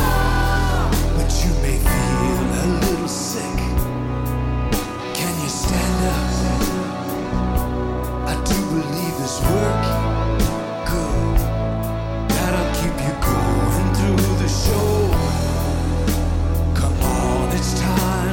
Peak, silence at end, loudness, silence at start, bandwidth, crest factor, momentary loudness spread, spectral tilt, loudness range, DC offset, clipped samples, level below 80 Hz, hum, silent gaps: -2 dBFS; 0 s; -20 LUFS; 0 s; 17 kHz; 18 dB; 5 LU; -5.5 dB/octave; 3 LU; under 0.1%; under 0.1%; -24 dBFS; none; none